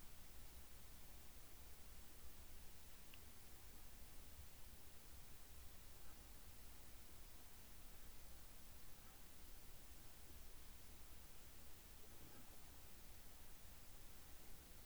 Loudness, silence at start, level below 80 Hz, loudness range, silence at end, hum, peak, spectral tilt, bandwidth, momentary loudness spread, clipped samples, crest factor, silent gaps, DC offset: -60 LUFS; 0 s; -64 dBFS; 0 LU; 0 s; none; -44 dBFS; -3 dB/octave; over 20 kHz; 0 LU; under 0.1%; 14 dB; none; 0.1%